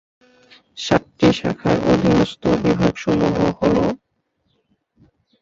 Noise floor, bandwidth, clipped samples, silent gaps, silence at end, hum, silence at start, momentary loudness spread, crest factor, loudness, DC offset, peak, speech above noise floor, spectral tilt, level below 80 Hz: -68 dBFS; 7.8 kHz; under 0.1%; none; 1.45 s; none; 0.75 s; 5 LU; 18 dB; -18 LUFS; under 0.1%; -2 dBFS; 51 dB; -6.5 dB/octave; -42 dBFS